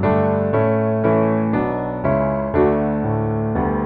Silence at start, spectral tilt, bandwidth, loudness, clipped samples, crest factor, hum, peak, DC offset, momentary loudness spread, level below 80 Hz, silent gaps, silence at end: 0 s; -12.5 dB/octave; 4.5 kHz; -19 LUFS; under 0.1%; 14 dB; none; -4 dBFS; under 0.1%; 4 LU; -38 dBFS; none; 0 s